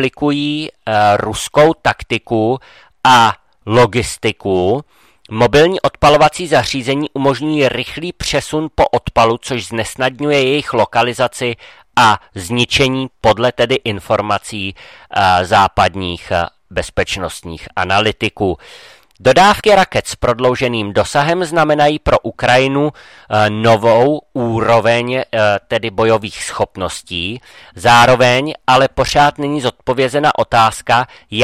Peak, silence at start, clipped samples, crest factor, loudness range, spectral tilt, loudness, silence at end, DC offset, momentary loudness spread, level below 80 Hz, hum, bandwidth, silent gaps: 0 dBFS; 0 s; under 0.1%; 14 dB; 3 LU; -4.5 dB/octave; -14 LUFS; 0 s; under 0.1%; 11 LU; -38 dBFS; none; 15.5 kHz; none